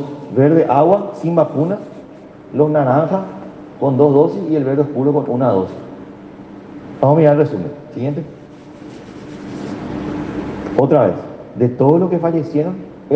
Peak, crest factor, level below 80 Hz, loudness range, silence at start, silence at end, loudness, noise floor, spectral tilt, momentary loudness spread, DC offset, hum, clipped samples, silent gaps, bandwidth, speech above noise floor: 0 dBFS; 16 dB; -50 dBFS; 5 LU; 0 s; 0 s; -16 LUFS; -37 dBFS; -10 dB/octave; 22 LU; under 0.1%; none; under 0.1%; none; 7.6 kHz; 23 dB